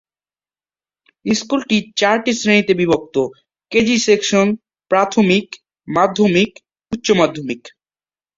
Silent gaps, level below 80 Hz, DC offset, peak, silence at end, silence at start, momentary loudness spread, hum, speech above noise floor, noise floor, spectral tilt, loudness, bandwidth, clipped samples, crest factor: none; -54 dBFS; under 0.1%; -2 dBFS; 0.7 s; 1.25 s; 13 LU; none; over 74 dB; under -90 dBFS; -4.5 dB/octave; -16 LUFS; 7.8 kHz; under 0.1%; 16 dB